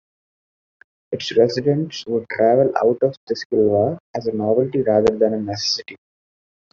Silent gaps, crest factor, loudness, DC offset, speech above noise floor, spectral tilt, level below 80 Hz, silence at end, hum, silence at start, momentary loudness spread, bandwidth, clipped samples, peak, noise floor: 3.17-3.27 s, 3.45-3.50 s, 4.00-4.14 s; 18 dB; -19 LUFS; under 0.1%; over 71 dB; -5 dB/octave; -56 dBFS; 0.75 s; none; 1.1 s; 9 LU; 7.4 kHz; under 0.1%; -2 dBFS; under -90 dBFS